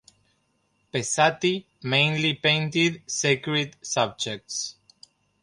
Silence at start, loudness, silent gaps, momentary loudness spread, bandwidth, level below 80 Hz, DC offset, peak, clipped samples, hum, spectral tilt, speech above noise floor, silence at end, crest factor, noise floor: 0.95 s; -24 LUFS; none; 10 LU; 11.5 kHz; -66 dBFS; under 0.1%; -4 dBFS; under 0.1%; none; -3.5 dB/octave; 45 dB; 0.7 s; 22 dB; -70 dBFS